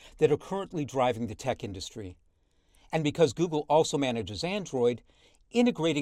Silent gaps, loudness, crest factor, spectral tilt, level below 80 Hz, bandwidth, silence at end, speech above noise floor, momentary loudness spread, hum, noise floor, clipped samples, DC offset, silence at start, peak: none; -29 LUFS; 20 dB; -5.5 dB/octave; -60 dBFS; 12.5 kHz; 0 s; 39 dB; 13 LU; none; -67 dBFS; under 0.1%; under 0.1%; 0.05 s; -10 dBFS